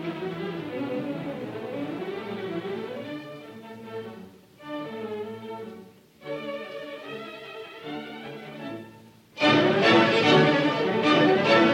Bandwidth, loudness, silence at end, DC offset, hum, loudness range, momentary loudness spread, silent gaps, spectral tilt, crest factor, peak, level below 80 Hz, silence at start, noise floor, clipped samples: 16 kHz; -24 LUFS; 0 s; under 0.1%; none; 16 LU; 21 LU; none; -5.5 dB/octave; 18 dB; -8 dBFS; -70 dBFS; 0 s; -50 dBFS; under 0.1%